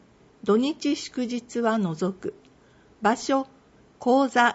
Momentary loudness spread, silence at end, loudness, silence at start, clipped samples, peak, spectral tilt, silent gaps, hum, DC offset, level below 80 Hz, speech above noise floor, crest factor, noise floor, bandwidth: 10 LU; 0 s; -25 LUFS; 0.45 s; under 0.1%; -6 dBFS; -5 dB/octave; none; none; under 0.1%; -66 dBFS; 32 dB; 20 dB; -56 dBFS; 8 kHz